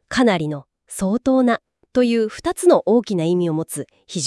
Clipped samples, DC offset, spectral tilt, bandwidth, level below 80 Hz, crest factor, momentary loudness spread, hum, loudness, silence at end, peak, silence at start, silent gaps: under 0.1%; under 0.1%; -5.5 dB/octave; 12 kHz; -52 dBFS; 16 dB; 13 LU; none; -19 LUFS; 0 s; -2 dBFS; 0.1 s; none